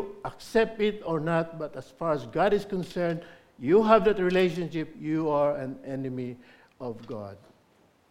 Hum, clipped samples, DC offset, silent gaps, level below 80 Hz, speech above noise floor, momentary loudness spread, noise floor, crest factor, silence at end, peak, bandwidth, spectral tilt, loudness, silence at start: none; under 0.1%; under 0.1%; none; -56 dBFS; 36 dB; 17 LU; -63 dBFS; 22 dB; 0.75 s; -6 dBFS; 14 kHz; -7 dB/octave; -27 LUFS; 0 s